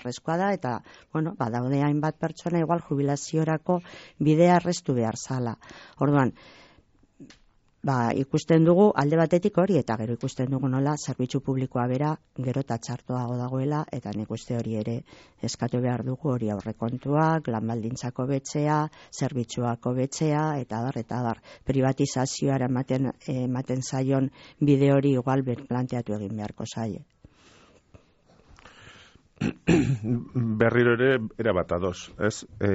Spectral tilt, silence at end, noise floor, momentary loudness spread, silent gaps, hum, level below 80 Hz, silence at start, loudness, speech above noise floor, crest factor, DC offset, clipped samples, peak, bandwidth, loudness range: -7 dB/octave; 0 s; -61 dBFS; 11 LU; none; none; -56 dBFS; 0 s; -26 LUFS; 36 dB; 18 dB; under 0.1%; under 0.1%; -8 dBFS; 8 kHz; 7 LU